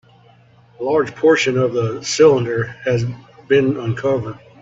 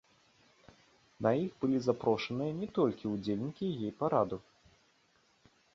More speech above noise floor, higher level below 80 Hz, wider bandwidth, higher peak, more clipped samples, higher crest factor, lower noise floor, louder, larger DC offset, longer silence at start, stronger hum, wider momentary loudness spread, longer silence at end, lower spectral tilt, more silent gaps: second, 33 dB vs 38 dB; first, -54 dBFS vs -68 dBFS; about the same, 8 kHz vs 7.6 kHz; first, -2 dBFS vs -14 dBFS; neither; second, 16 dB vs 22 dB; second, -49 dBFS vs -70 dBFS; first, -17 LUFS vs -34 LUFS; neither; second, 0.8 s vs 1.2 s; neither; first, 11 LU vs 6 LU; second, 0.25 s vs 1.35 s; second, -5.5 dB/octave vs -7.5 dB/octave; neither